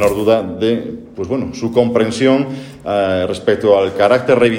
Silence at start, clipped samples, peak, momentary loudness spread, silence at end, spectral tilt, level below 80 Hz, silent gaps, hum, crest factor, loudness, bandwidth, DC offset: 0 s; under 0.1%; 0 dBFS; 9 LU; 0 s; -6 dB/octave; -48 dBFS; none; none; 14 dB; -15 LUFS; 16.5 kHz; under 0.1%